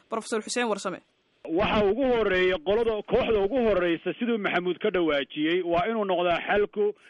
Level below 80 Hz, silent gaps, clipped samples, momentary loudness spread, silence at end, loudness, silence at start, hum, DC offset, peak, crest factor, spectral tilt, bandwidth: -48 dBFS; none; under 0.1%; 6 LU; 0.15 s; -26 LUFS; 0.1 s; none; under 0.1%; -10 dBFS; 16 dB; -5 dB/octave; 11.5 kHz